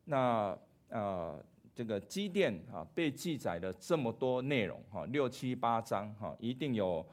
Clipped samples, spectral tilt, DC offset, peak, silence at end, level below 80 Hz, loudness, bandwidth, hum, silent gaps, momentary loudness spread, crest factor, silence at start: under 0.1%; -6 dB/octave; under 0.1%; -18 dBFS; 0 s; -70 dBFS; -37 LUFS; 16 kHz; none; none; 11 LU; 18 dB; 0.05 s